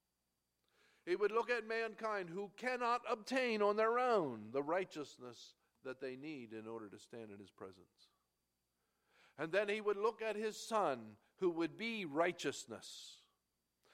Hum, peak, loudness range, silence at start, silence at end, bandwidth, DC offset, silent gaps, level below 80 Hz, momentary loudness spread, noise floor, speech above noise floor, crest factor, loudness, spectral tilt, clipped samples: none; -22 dBFS; 14 LU; 1.05 s; 0.8 s; 14.5 kHz; under 0.1%; none; -88 dBFS; 19 LU; -87 dBFS; 47 dB; 20 dB; -40 LUFS; -4.5 dB/octave; under 0.1%